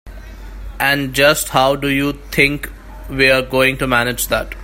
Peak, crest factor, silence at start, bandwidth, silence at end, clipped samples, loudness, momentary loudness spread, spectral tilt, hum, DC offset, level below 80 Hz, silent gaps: 0 dBFS; 16 dB; 0.05 s; 16.5 kHz; 0 s; under 0.1%; -15 LUFS; 18 LU; -3.5 dB/octave; none; under 0.1%; -34 dBFS; none